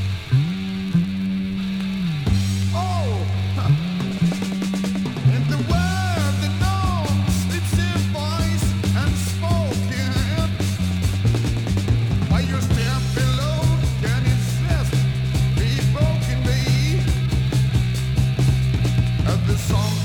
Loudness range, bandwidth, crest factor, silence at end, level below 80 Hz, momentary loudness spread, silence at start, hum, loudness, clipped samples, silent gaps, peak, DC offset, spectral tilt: 2 LU; 18.5 kHz; 12 dB; 0 s; -30 dBFS; 4 LU; 0 s; none; -21 LUFS; under 0.1%; none; -6 dBFS; under 0.1%; -6 dB/octave